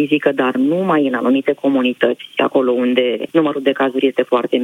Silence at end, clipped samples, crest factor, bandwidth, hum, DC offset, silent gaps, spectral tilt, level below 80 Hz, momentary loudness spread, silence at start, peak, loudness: 0 s; under 0.1%; 16 dB; 10.5 kHz; none; under 0.1%; none; -7 dB/octave; -74 dBFS; 2 LU; 0 s; 0 dBFS; -16 LUFS